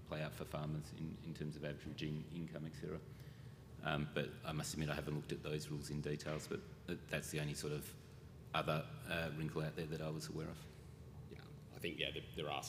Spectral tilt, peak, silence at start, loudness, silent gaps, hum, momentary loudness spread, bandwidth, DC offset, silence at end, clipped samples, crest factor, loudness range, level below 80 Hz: -5 dB/octave; -22 dBFS; 0 s; -45 LUFS; none; none; 14 LU; 15.5 kHz; under 0.1%; 0 s; under 0.1%; 24 dB; 3 LU; -64 dBFS